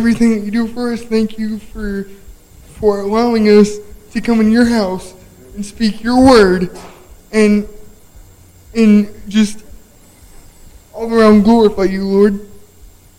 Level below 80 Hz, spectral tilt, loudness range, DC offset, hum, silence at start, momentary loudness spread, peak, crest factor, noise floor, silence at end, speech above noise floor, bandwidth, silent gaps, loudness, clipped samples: -36 dBFS; -6 dB/octave; 4 LU; under 0.1%; none; 0 s; 17 LU; 0 dBFS; 14 dB; -42 dBFS; 0.65 s; 30 dB; 15.5 kHz; none; -13 LUFS; under 0.1%